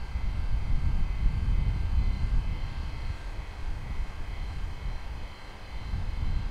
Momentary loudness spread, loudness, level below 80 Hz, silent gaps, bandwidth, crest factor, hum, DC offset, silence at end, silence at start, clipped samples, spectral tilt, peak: 10 LU; -34 LUFS; -30 dBFS; none; 7.2 kHz; 16 dB; none; under 0.1%; 0 s; 0 s; under 0.1%; -6.5 dB/octave; -12 dBFS